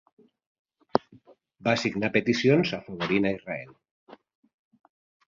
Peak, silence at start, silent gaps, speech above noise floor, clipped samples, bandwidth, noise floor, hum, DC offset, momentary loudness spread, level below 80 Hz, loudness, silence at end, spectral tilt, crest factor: -2 dBFS; 0.95 s; 3.91-4.07 s; 31 dB; under 0.1%; 7.6 kHz; -56 dBFS; none; under 0.1%; 13 LU; -62 dBFS; -26 LUFS; 1.15 s; -6 dB/octave; 28 dB